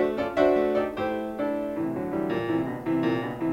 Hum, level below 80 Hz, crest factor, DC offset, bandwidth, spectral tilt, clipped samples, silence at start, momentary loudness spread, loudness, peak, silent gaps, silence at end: none; -54 dBFS; 18 dB; under 0.1%; 16 kHz; -7.5 dB/octave; under 0.1%; 0 s; 7 LU; -27 LUFS; -8 dBFS; none; 0 s